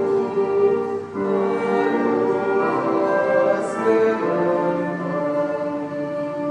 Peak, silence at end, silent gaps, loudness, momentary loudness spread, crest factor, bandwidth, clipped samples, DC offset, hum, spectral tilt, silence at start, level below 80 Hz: -8 dBFS; 0 s; none; -21 LUFS; 7 LU; 12 dB; 10 kHz; under 0.1%; under 0.1%; none; -7.5 dB/octave; 0 s; -66 dBFS